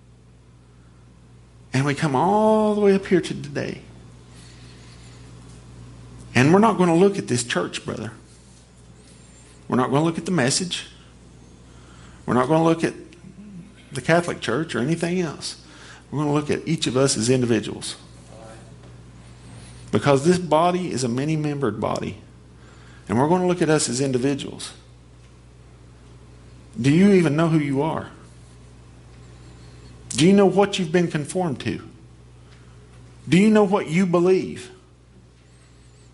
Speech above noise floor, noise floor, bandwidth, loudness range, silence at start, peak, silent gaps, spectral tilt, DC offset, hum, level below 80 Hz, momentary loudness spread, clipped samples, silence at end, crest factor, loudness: 30 dB; -50 dBFS; 11.5 kHz; 4 LU; 1.75 s; -2 dBFS; none; -5.5 dB/octave; under 0.1%; none; -52 dBFS; 24 LU; under 0.1%; 1.4 s; 20 dB; -21 LUFS